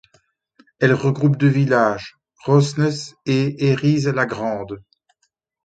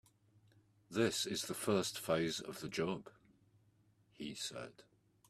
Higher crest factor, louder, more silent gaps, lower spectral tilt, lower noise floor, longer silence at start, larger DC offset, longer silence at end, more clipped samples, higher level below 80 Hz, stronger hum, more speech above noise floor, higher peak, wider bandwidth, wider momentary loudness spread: about the same, 18 dB vs 22 dB; first, -19 LUFS vs -39 LUFS; neither; first, -7 dB/octave vs -4 dB/octave; about the same, -70 dBFS vs -72 dBFS; about the same, 0.8 s vs 0.9 s; neither; first, 0.85 s vs 0.45 s; neither; first, -58 dBFS vs -74 dBFS; neither; first, 52 dB vs 33 dB; first, -2 dBFS vs -20 dBFS; second, 9 kHz vs 15.5 kHz; about the same, 14 LU vs 12 LU